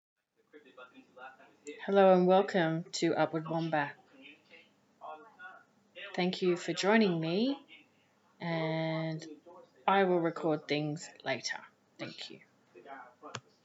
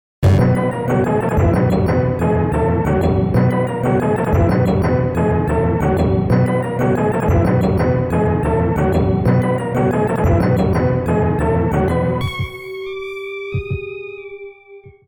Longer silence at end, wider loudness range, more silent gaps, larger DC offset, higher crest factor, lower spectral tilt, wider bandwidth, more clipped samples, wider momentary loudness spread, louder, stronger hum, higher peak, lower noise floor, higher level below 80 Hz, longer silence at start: about the same, 0.25 s vs 0.15 s; first, 8 LU vs 3 LU; neither; neither; first, 22 dB vs 10 dB; second, -5.5 dB/octave vs -8.5 dB/octave; second, 8 kHz vs 18.5 kHz; neither; first, 24 LU vs 11 LU; second, -31 LUFS vs -17 LUFS; neither; second, -12 dBFS vs -6 dBFS; first, -69 dBFS vs -41 dBFS; second, under -90 dBFS vs -30 dBFS; first, 0.55 s vs 0.2 s